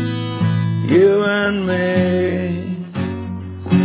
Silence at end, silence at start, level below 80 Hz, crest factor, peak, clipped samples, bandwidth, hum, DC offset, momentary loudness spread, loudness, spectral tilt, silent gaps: 0 s; 0 s; -40 dBFS; 14 dB; -4 dBFS; under 0.1%; 4 kHz; none; under 0.1%; 12 LU; -18 LUFS; -11.5 dB/octave; none